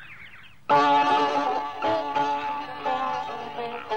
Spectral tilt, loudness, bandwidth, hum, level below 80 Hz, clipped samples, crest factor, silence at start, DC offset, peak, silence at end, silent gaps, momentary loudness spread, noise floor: -4.5 dB/octave; -25 LUFS; 8.8 kHz; none; -66 dBFS; under 0.1%; 14 dB; 0 s; 0.4%; -10 dBFS; 0 s; none; 17 LU; -48 dBFS